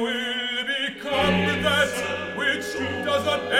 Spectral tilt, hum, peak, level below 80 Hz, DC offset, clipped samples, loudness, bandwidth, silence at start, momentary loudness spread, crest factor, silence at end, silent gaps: -4 dB/octave; none; -6 dBFS; -52 dBFS; under 0.1%; under 0.1%; -23 LUFS; 17 kHz; 0 s; 6 LU; 18 dB; 0 s; none